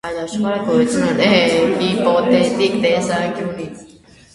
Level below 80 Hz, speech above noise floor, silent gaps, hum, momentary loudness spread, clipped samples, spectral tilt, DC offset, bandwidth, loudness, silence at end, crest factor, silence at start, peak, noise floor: -50 dBFS; 29 dB; none; none; 11 LU; under 0.1%; -5 dB/octave; under 0.1%; 11.5 kHz; -16 LUFS; 0.5 s; 16 dB; 0.05 s; 0 dBFS; -45 dBFS